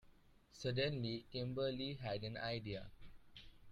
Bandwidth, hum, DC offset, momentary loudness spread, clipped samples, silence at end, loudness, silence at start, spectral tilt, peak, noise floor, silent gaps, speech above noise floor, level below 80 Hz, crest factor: 11 kHz; none; under 0.1%; 21 LU; under 0.1%; 0 s; -43 LUFS; 0.05 s; -6 dB/octave; -26 dBFS; -67 dBFS; none; 24 dB; -64 dBFS; 18 dB